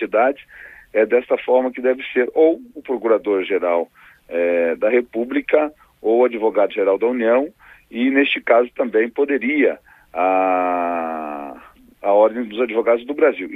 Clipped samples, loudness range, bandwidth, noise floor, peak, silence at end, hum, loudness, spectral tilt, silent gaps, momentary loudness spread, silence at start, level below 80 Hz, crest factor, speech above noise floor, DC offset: under 0.1%; 2 LU; 3.9 kHz; -45 dBFS; -2 dBFS; 0 s; none; -18 LUFS; -6.5 dB/octave; none; 11 LU; 0 s; -60 dBFS; 16 dB; 27 dB; under 0.1%